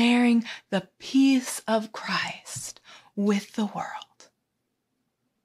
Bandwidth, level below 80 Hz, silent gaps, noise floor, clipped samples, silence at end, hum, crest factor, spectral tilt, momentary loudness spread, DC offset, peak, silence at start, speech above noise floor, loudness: 14.5 kHz; -74 dBFS; none; -79 dBFS; under 0.1%; 1.4 s; none; 16 dB; -4.5 dB/octave; 16 LU; under 0.1%; -10 dBFS; 0 s; 53 dB; -26 LUFS